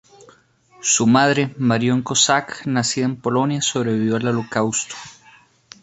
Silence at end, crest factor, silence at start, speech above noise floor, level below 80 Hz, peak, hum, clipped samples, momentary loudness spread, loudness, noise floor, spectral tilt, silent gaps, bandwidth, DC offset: 0.7 s; 18 dB; 0.8 s; 34 dB; -60 dBFS; -2 dBFS; none; under 0.1%; 8 LU; -19 LUFS; -53 dBFS; -3.5 dB/octave; none; 8.2 kHz; under 0.1%